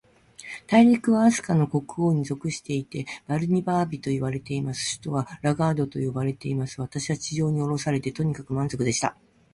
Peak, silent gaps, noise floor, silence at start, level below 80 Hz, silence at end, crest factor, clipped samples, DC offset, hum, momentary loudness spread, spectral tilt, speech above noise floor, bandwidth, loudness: -6 dBFS; none; -45 dBFS; 0.4 s; -56 dBFS; 0.4 s; 18 dB; under 0.1%; under 0.1%; none; 10 LU; -6 dB/octave; 21 dB; 11.5 kHz; -25 LUFS